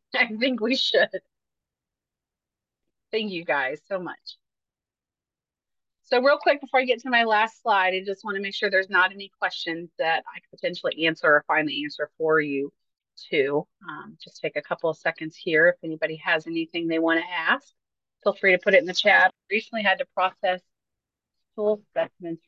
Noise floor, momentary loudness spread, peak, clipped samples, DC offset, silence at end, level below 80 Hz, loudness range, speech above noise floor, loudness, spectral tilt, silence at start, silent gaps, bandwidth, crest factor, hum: under -90 dBFS; 12 LU; -6 dBFS; under 0.1%; under 0.1%; 0.1 s; -80 dBFS; 10 LU; over 66 dB; -24 LUFS; -4.5 dB/octave; 0.15 s; none; 7.6 kHz; 20 dB; none